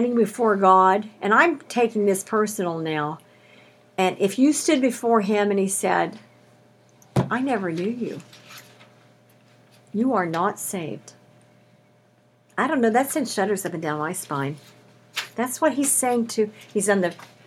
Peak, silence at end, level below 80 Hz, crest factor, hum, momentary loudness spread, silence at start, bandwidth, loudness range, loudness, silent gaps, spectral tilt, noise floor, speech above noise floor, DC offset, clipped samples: -2 dBFS; 0.2 s; -68 dBFS; 20 dB; none; 13 LU; 0 s; 18.5 kHz; 7 LU; -22 LUFS; none; -4.5 dB/octave; -59 dBFS; 37 dB; under 0.1%; under 0.1%